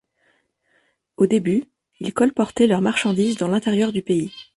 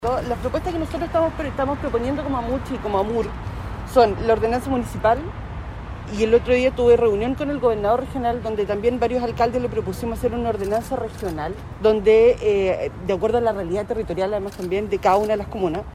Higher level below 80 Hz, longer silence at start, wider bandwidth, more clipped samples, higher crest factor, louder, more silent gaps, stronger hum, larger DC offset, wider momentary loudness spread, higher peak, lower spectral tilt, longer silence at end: second, -60 dBFS vs -36 dBFS; first, 1.2 s vs 0 s; second, 11.5 kHz vs 15 kHz; neither; about the same, 18 dB vs 18 dB; about the same, -20 LUFS vs -21 LUFS; neither; neither; neither; second, 6 LU vs 11 LU; about the same, -4 dBFS vs -4 dBFS; about the same, -6 dB/octave vs -6.5 dB/octave; first, 0.15 s vs 0 s